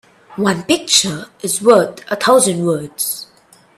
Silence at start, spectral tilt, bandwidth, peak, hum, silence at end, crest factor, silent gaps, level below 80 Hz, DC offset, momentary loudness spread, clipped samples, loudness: 0.3 s; -3 dB/octave; 15.5 kHz; 0 dBFS; none; 0.55 s; 16 dB; none; -58 dBFS; under 0.1%; 10 LU; under 0.1%; -15 LUFS